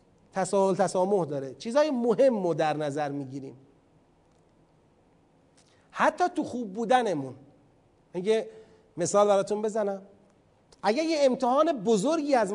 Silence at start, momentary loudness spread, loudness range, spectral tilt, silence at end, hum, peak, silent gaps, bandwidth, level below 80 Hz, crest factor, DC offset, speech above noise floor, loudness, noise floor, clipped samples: 0.35 s; 14 LU; 7 LU; -5 dB/octave; 0 s; none; -8 dBFS; none; 11 kHz; -72 dBFS; 20 dB; under 0.1%; 37 dB; -26 LUFS; -63 dBFS; under 0.1%